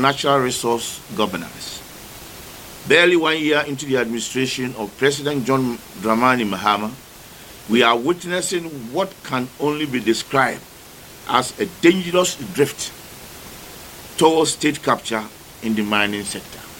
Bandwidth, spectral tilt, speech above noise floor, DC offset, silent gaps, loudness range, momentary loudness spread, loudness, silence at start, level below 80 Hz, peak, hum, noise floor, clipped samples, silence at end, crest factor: 17 kHz; -3.5 dB/octave; 22 dB; under 0.1%; none; 3 LU; 20 LU; -19 LUFS; 0 s; -52 dBFS; 0 dBFS; none; -41 dBFS; under 0.1%; 0 s; 20 dB